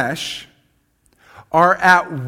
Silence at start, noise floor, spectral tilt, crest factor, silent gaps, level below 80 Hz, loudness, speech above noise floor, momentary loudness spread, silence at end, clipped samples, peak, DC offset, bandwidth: 0 s; -61 dBFS; -4 dB/octave; 18 dB; none; -56 dBFS; -15 LUFS; 45 dB; 15 LU; 0 s; under 0.1%; 0 dBFS; under 0.1%; 16.5 kHz